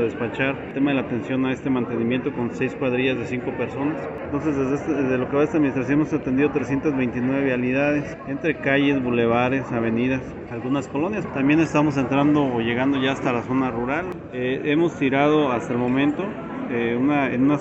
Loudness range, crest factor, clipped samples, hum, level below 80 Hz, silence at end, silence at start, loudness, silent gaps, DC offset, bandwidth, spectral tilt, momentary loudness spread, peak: 3 LU; 16 dB; under 0.1%; none; -52 dBFS; 0 s; 0 s; -22 LUFS; none; under 0.1%; 8 kHz; -7 dB/octave; 7 LU; -6 dBFS